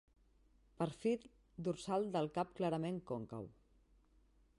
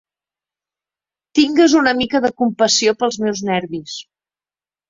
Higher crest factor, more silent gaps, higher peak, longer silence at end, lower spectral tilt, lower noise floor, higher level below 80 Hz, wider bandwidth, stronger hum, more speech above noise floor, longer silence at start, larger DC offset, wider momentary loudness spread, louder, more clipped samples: about the same, 16 dB vs 18 dB; neither; second, -26 dBFS vs 0 dBFS; first, 1.1 s vs 0.85 s; first, -7 dB/octave vs -3 dB/octave; second, -71 dBFS vs under -90 dBFS; second, -70 dBFS vs -58 dBFS; first, 11.5 kHz vs 7.8 kHz; neither; second, 31 dB vs over 74 dB; second, 0.8 s vs 1.35 s; neither; second, 12 LU vs 15 LU; second, -41 LUFS vs -16 LUFS; neither